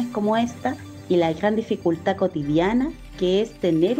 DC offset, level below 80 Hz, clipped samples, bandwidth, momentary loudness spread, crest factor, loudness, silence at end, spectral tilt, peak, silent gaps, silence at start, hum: under 0.1%; -48 dBFS; under 0.1%; 15.5 kHz; 7 LU; 14 dB; -23 LUFS; 0 s; -6.5 dB/octave; -8 dBFS; none; 0 s; none